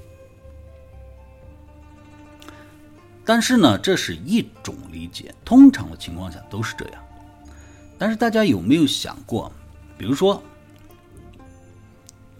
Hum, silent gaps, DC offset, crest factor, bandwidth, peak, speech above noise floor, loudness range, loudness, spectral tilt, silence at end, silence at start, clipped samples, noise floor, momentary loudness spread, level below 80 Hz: none; none; under 0.1%; 20 dB; 15.5 kHz; -2 dBFS; 29 dB; 8 LU; -19 LUFS; -5 dB/octave; 2 s; 0.55 s; under 0.1%; -47 dBFS; 21 LU; -48 dBFS